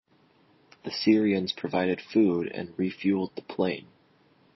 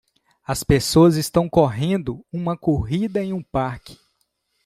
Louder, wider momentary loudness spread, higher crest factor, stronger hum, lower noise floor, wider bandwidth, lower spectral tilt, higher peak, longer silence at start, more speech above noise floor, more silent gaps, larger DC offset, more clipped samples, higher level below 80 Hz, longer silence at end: second, -27 LUFS vs -20 LUFS; about the same, 11 LU vs 13 LU; about the same, 20 dB vs 18 dB; neither; second, -63 dBFS vs -70 dBFS; second, 6 kHz vs 15.5 kHz; about the same, -7 dB/octave vs -6 dB/octave; second, -8 dBFS vs -2 dBFS; first, 0.85 s vs 0.5 s; second, 36 dB vs 51 dB; neither; neither; neither; second, -64 dBFS vs -42 dBFS; about the same, 0.75 s vs 0.7 s